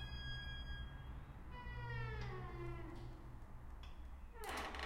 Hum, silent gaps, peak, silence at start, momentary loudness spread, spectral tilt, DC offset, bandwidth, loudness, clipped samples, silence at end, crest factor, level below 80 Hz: none; none; -30 dBFS; 0 s; 10 LU; -5 dB/octave; under 0.1%; 16 kHz; -50 LUFS; under 0.1%; 0 s; 18 dB; -52 dBFS